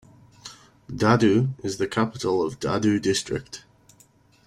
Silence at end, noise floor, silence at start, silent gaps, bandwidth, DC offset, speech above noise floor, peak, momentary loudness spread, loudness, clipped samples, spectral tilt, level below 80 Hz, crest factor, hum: 0.9 s; -57 dBFS; 0.45 s; none; 14.5 kHz; under 0.1%; 35 dB; -4 dBFS; 23 LU; -23 LUFS; under 0.1%; -5.5 dB/octave; -56 dBFS; 20 dB; none